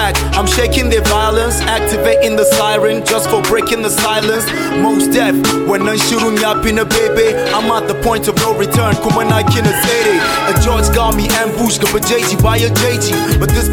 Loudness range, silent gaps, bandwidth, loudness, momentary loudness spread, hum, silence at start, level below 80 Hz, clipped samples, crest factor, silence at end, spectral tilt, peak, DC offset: 1 LU; none; 17.5 kHz; -12 LUFS; 2 LU; none; 0 s; -24 dBFS; under 0.1%; 12 dB; 0 s; -4 dB/octave; 0 dBFS; under 0.1%